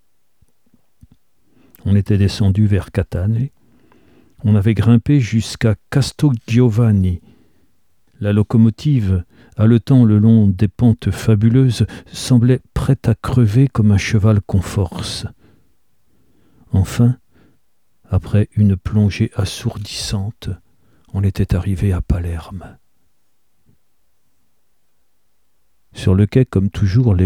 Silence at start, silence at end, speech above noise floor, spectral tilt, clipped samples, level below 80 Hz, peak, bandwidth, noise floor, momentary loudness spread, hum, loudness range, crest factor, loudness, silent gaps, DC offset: 1.85 s; 0 s; 54 dB; -7.5 dB/octave; under 0.1%; -36 dBFS; -2 dBFS; 13 kHz; -69 dBFS; 11 LU; none; 8 LU; 16 dB; -16 LUFS; none; 0.2%